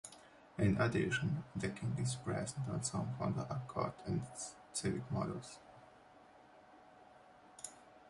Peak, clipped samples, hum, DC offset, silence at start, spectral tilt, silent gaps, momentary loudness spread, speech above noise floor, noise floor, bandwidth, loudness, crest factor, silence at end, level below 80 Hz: -20 dBFS; under 0.1%; none; under 0.1%; 0.05 s; -5.5 dB/octave; none; 19 LU; 23 dB; -62 dBFS; 11.5 kHz; -39 LUFS; 20 dB; 0 s; -62 dBFS